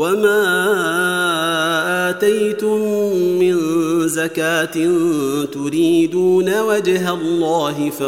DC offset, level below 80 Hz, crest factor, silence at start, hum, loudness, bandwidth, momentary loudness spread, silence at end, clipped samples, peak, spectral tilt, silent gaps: 0.2%; -66 dBFS; 12 dB; 0 s; none; -16 LUFS; 16.5 kHz; 4 LU; 0 s; under 0.1%; -4 dBFS; -4.5 dB/octave; none